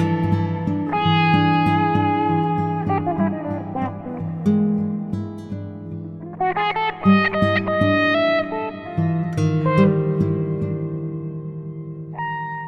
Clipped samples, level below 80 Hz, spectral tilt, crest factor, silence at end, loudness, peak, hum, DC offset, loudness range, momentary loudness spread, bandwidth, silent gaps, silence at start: under 0.1%; -52 dBFS; -8 dB/octave; 16 dB; 0 s; -20 LUFS; -4 dBFS; none; under 0.1%; 5 LU; 15 LU; 6.4 kHz; none; 0 s